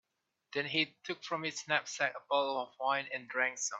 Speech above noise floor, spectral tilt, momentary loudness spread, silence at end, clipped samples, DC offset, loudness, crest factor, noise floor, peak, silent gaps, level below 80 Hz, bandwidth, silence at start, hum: 38 dB; -2 dB/octave; 6 LU; 0 s; under 0.1%; under 0.1%; -35 LUFS; 22 dB; -74 dBFS; -14 dBFS; none; -86 dBFS; 8.4 kHz; 0.5 s; none